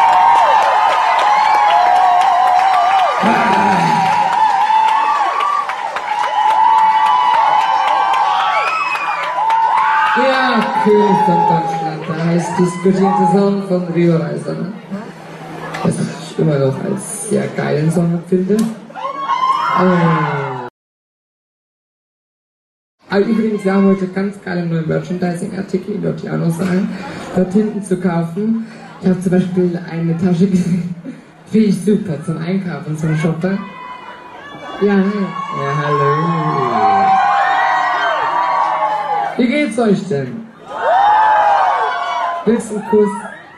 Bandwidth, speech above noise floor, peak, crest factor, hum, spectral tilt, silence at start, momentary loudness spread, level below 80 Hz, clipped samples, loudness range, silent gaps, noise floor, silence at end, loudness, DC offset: 12.5 kHz; over 75 dB; 0 dBFS; 14 dB; none; -6 dB/octave; 0 s; 11 LU; -56 dBFS; under 0.1%; 7 LU; 20.70-22.98 s; under -90 dBFS; 0 s; -14 LUFS; under 0.1%